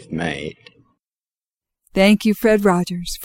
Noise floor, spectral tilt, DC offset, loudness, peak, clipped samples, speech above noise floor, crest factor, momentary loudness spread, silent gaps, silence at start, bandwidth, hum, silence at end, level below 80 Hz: under -90 dBFS; -5.5 dB/octave; under 0.1%; -17 LUFS; -2 dBFS; under 0.1%; over 72 dB; 18 dB; 13 LU; none; 0 s; 17 kHz; none; 0 s; -44 dBFS